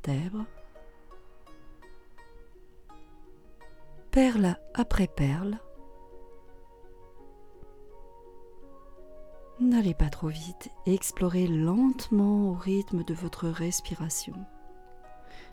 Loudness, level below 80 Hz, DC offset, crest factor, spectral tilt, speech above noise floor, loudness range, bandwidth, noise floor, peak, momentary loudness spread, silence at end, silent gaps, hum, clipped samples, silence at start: -28 LUFS; -42 dBFS; under 0.1%; 20 dB; -6 dB/octave; 22 dB; 10 LU; 18 kHz; -50 dBFS; -10 dBFS; 16 LU; 0 s; none; none; under 0.1%; 0 s